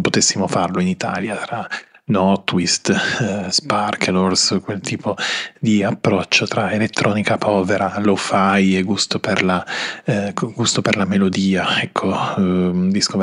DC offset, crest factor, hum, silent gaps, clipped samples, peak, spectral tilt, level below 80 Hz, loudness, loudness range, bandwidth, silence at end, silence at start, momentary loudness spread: under 0.1%; 18 dB; none; none; under 0.1%; 0 dBFS; -4 dB/octave; -58 dBFS; -18 LUFS; 2 LU; 11 kHz; 0 s; 0 s; 7 LU